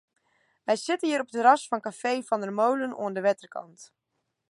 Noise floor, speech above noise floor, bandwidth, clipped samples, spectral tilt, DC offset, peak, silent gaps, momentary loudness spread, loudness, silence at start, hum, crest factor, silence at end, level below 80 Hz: -70 dBFS; 44 dB; 11.5 kHz; under 0.1%; -4 dB/octave; under 0.1%; -6 dBFS; none; 12 LU; -26 LUFS; 0.65 s; none; 22 dB; 0.65 s; -84 dBFS